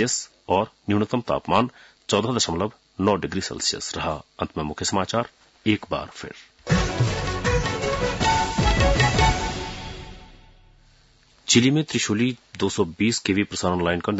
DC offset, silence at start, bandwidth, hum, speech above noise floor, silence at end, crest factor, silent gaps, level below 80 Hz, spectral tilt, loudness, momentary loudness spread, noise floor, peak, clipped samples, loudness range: under 0.1%; 0 s; 8 kHz; none; 33 dB; 0 s; 18 dB; none; -36 dBFS; -4.5 dB/octave; -23 LUFS; 12 LU; -57 dBFS; -6 dBFS; under 0.1%; 4 LU